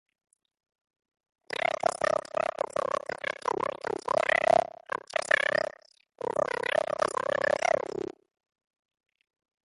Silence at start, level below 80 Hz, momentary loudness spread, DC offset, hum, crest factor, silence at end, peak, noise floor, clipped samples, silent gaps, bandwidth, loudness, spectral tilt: 1.8 s; -68 dBFS; 11 LU; under 0.1%; none; 22 dB; 1.6 s; -10 dBFS; -57 dBFS; under 0.1%; none; 11.5 kHz; -29 LUFS; -3 dB/octave